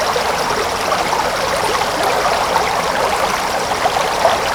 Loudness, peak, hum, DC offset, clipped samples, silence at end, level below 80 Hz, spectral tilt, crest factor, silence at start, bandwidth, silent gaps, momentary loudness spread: -16 LUFS; 0 dBFS; none; under 0.1%; under 0.1%; 0 s; -40 dBFS; -2 dB/octave; 16 dB; 0 s; over 20 kHz; none; 2 LU